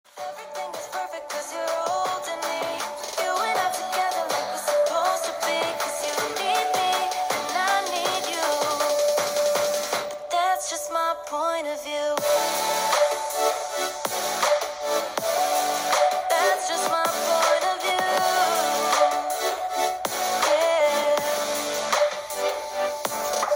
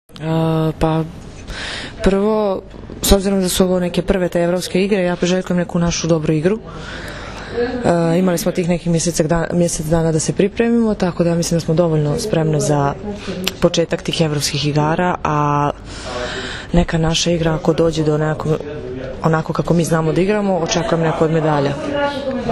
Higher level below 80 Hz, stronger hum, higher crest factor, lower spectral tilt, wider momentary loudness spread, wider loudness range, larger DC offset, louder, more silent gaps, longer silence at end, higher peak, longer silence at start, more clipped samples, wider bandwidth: second, -66 dBFS vs -32 dBFS; neither; about the same, 16 dB vs 16 dB; second, -0.5 dB/octave vs -5.5 dB/octave; second, 7 LU vs 10 LU; about the same, 3 LU vs 2 LU; neither; second, -24 LUFS vs -17 LUFS; neither; about the same, 0 s vs 0 s; second, -8 dBFS vs 0 dBFS; about the same, 0.15 s vs 0.1 s; neither; first, 17 kHz vs 13.5 kHz